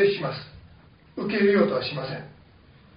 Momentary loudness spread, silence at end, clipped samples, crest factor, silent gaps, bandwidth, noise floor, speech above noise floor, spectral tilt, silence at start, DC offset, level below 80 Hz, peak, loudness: 22 LU; 0.7 s; under 0.1%; 20 dB; none; 5.2 kHz; -53 dBFS; 29 dB; -4.5 dB/octave; 0 s; under 0.1%; -58 dBFS; -6 dBFS; -25 LUFS